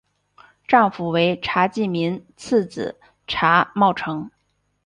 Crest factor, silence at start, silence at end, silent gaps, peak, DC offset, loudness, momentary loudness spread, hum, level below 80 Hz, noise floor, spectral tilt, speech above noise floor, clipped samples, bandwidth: 20 dB; 0.7 s; 0.6 s; none; -2 dBFS; under 0.1%; -20 LUFS; 14 LU; 50 Hz at -60 dBFS; -56 dBFS; -53 dBFS; -6 dB/octave; 33 dB; under 0.1%; 10.5 kHz